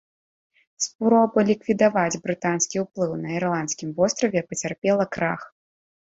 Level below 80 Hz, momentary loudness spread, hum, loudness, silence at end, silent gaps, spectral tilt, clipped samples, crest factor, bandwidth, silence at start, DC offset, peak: -62 dBFS; 8 LU; none; -23 LUFS; 0.7 s; 0.95-0.99 s, 4.78-4.82 s; -4.5 dB/octave; under 0.1%; 18 dB; 8 kHz; 0.8 s; under 0.1%; -6 dBFS